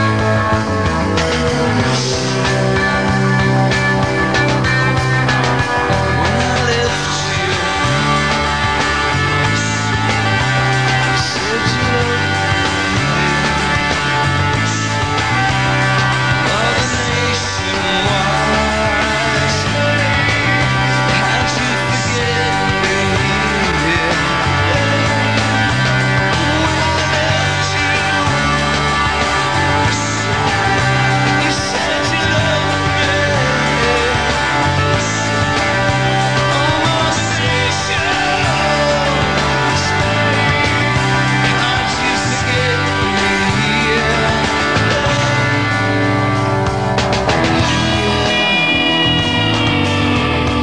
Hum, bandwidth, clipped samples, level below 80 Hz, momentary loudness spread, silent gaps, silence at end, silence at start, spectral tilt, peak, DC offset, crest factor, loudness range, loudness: none; 10.5 kHz; under 0.1%; -32 dBFS; 2 LU; none; 0 s; 0 s; -4.5 dB/octave; 0 dBFS; 1%; 14 dB; 1 LU; -14 LUFS